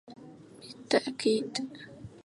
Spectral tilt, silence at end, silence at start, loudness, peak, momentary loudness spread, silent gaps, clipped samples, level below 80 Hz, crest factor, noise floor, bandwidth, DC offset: -4 dB/octave; 0.05 s; 0.1 s; -30 LUFS; -12 dBFS; 22 LU; none; under 0.1%; -68 dBFS; 22 dB; -50 dBFS; 11.5 kHz; under 0.1%